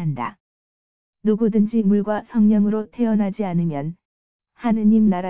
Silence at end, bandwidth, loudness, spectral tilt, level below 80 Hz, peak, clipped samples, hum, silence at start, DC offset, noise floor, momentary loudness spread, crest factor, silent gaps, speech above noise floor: 0 s; 3.5 kHz; -20 LUFS; -13 dB/octave; -58 dBFS; -8 dBFS; under 0.1%; none; 0 s; 0.8%; under -90 dBFS; 11 LU; 12 dB; 0.40-1.13 s, 4.05-4.39 s; over 71 dB